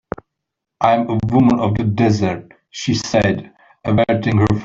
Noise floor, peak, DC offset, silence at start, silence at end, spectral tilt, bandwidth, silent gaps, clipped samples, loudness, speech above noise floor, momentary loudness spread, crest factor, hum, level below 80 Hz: -80 dBFS; -2 dBFS; under 0.1%; 0.8 s; 0 s; -6.5 dB/octave; 7.6 kHz; none; under 0.1%; -17 LUFS; 64 dB; 14 LU; 14 dB; none; -44 dBFS